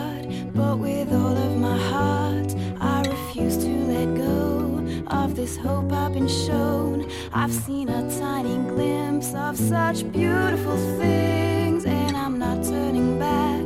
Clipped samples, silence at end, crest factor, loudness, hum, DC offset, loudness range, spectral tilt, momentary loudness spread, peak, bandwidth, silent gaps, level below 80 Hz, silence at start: under 0.1%; 0 s; 14 dB; -24 LUFS; none; under 0.1%; 2 LU; -6 dB/octave; 4 LU; -8 dBFS; 16 kHz; none; -42 dBFS; 0 s